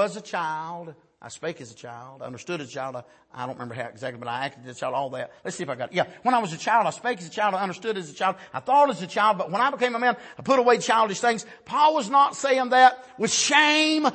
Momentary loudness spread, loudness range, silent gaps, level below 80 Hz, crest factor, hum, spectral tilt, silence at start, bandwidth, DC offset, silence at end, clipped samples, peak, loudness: 16 LU; 14 LU; none; -74 dBFS; 20 dB; none; -3 dB/octave; 0 s; 8.8 kHz; under 0.1%; 0 s; under 0.1%; -4 dBFS; -23 LUFS